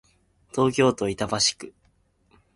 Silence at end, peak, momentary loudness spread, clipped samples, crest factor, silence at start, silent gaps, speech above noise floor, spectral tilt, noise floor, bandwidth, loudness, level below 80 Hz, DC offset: 0.85 s; -8 dBFS; 17 LU; under 0.1%; 18 dB; 0.55 s; none; 41 dB; -3.5 dB/octave; -65 dBFS; 11.5 kHz; -23 LUFS; -56 dBFS; under 0.1%